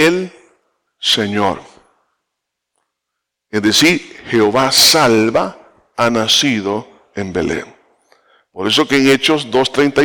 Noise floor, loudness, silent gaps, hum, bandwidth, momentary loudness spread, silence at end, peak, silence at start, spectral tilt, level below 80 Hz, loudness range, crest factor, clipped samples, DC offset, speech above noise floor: -78 dBFS; -13 LUFS; none; none; 18 kHz; 15 LU; 0 s; -2 dBFS; 0 s; -3 dB/octave; -52 dBFS; 7 LU; 14 dB; under 0.1%; under 0.1%; 64 dB